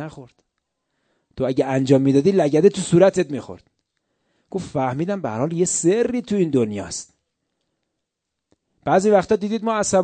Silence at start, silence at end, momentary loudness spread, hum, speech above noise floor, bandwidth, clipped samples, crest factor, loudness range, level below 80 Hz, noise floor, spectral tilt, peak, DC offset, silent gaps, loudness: 0 s; 0 s; 15 LU; none; 62 dB; 9.2 kHz; under 0.1%; 18 dB; 5 LU; -56 dBFS; -80 dBFS; -5.5 dB/octave; -2 dBFS; under 0.1%; none; -19 LUFS